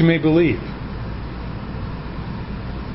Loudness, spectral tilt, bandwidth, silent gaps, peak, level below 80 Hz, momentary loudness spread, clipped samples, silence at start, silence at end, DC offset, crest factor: -23 LUFS; -12 dB/octave; 5.8 kHz; none; -4 dBFS; -34 dBFS; 14 LU; under 0.1%; 0 s; 0 s; under 0.1%; 18 dB